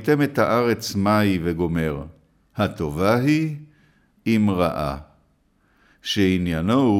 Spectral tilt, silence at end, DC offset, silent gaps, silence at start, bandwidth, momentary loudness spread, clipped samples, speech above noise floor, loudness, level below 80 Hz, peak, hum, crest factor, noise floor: -6.5 dB/octave; 0 s; under 0.1%; none; 0 s; 16.5 kHz; 13 LU; under 0.1%; 42 dB; -21 LUFS; -44 dBFS; -6 dBFS; none; 16 dB; -63 dBFS